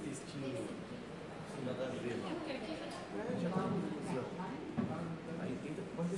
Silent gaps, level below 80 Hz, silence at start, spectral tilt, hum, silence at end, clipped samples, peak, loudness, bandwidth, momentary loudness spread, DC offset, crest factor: none; -70 dBFS; 0 s; -6.5 dB/octave; none; 0 s; under 0.1%; -24 dBFS; -42 LUFS; 11.5 kHz; 8 LU; under 0.1%; 18 dB